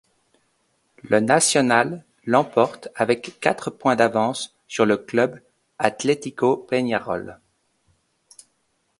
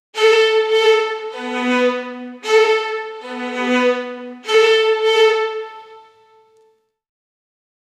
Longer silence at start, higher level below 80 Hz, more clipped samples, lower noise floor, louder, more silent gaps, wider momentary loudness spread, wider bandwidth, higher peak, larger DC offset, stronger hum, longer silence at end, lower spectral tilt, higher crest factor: first, 1.05 s vs 0.15 s; first, -64 dBFS vs -76 dBFS; neither; first, -70 dBFS vs -58 dBFS; second, -21 LUFS vs -16 LUFS; neither; second, 10 LU vs 15 LU; about the same, 11.5 kHz vs 11.5 kHz; about the same, 0 dBFS vs -2 dBFS; neither; neither; second, 1.65 s vs 2 s; first, -4 dB/octave vs -1.5 dB/octave; first, 22 dB vs 16 dB